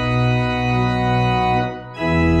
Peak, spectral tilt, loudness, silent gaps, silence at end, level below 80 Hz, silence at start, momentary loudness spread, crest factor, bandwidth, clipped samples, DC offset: -4 dBFS; -7.5 dB/octave; -19 LUFS; none; 0 s; -32 dBFS; 0 s; 4 LU; 14 dB; 8 kHz; under 0.1%; under 0.1%